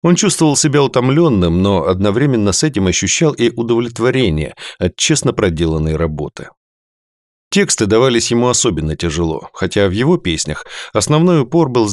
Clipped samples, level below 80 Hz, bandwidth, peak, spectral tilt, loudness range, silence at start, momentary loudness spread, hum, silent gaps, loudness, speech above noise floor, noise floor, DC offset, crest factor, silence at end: under 0.1%; -38 dBFS; 12.5 kHz; -2 dBFS; -4.5 dB/octave; 4 LU; 0.05 s; 9 LU; none; 6.57-7.51 s; -14 LUFS; over 76 dB; under -90 dBFS; under 0.1%; 14 dB; 0 s